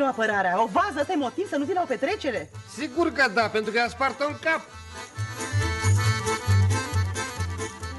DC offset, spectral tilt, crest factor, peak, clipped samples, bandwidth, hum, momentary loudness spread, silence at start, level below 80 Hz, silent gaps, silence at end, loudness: under 0.1%; -5 dB/octave; 16 dB; -10 dBFS; under 0.1%; 11.5 kHz; none; 11 LU; 0 s; -46 dBFS; none; 0 s; -25 LUFS